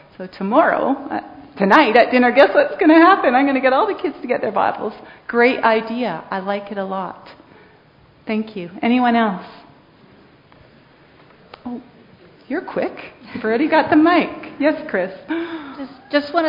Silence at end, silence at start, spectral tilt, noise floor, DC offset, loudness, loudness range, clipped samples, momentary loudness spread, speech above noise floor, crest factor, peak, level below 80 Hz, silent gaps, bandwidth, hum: 0 s; 0.2 s; -7.5 dB/octave; -50 dBFS; under 0.1%; -17 LUFS; 13 LU; under 0.1%; 19 LU; 33 dB; 18 dB; 0 dBFS; -60 dBFS; none; 6 kHz; none